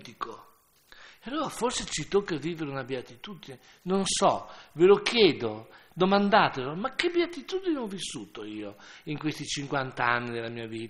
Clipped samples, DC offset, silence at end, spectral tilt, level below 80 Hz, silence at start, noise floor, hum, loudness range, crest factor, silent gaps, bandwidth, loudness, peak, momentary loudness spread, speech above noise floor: under 0.1%; under 0.1%; 0 s; -4 dB/octave; -60 dBFS; 0 s; -60 dBFS; none; 8 LU; 22 dB; none; 12.5 kHz; -27 LUFS; -6 dBFS; 21 LU; 32 dB